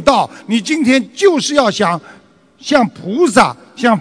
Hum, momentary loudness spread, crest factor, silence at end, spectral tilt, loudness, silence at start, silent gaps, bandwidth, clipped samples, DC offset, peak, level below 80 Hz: none; 7 LU; 14 dB; 0 s; -4 dB/octave; -14 LUFS; 0 s; none; 11 kHz; 0.4%; under 0.1%; 0 dBFS; -48 dBFS